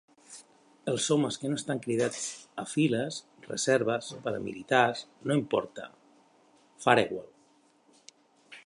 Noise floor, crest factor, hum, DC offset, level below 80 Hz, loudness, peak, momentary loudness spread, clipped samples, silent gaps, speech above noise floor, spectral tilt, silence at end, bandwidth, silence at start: -64 dBFS; 26 dB; none; under 0.1%; -72 dBFS; -29 LUFS; -6 dBFS; 17 LU; under 0.1%; none; 35 dB; -4 dB/octave; 0.05 s; 11.5 kHz; 0.3 s